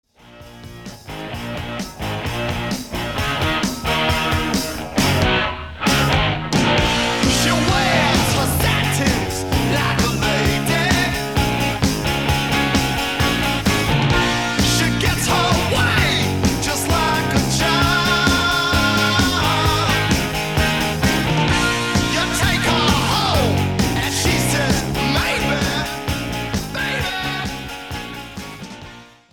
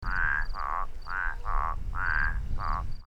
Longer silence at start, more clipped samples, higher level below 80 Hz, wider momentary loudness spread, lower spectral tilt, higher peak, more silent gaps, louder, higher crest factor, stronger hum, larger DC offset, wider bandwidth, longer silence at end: first, 0.25 s vs 0 s; neither; about the same, -30 dBFS vs -32 dBFS; first, 10 LU vs 6 LU; second, -4 dB/octave vs -5.5 dB/octave; first, -2 dBFS vs -14 dBFS; neither; first, -18 LUFS vs -32 LUFS; about the same, 18 dB vs 14 dB; neither; first, 0.5% vs under 0.1%; first, 19 kHz vs 5.6 kHz; first, 0.25 s vs 0 s